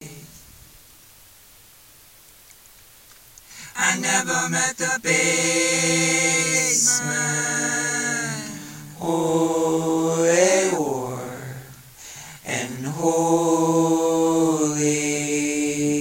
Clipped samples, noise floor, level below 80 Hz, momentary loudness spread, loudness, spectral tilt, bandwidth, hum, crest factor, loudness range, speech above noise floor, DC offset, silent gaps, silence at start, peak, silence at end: under 0.1%; -50 dBFS; -60 dBFS; 17 LU; -20 LUFS; -3 dB/octave; 16.5 kHz; none; 20 dB; 6 LU; 29 dB; under 0.1%; none; 0 s; -4 dBFS; 0 s